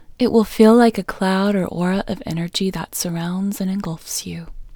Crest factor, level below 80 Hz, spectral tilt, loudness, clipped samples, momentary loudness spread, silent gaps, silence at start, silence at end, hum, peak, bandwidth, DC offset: 18 dB; -44 dBFS; -5.5 dB/octave; -19 LUFS; under 0.1%; 13 LU; none; 0.1 s; 0 s; none; 0 dBFS; over 20 kHz; under 0.1%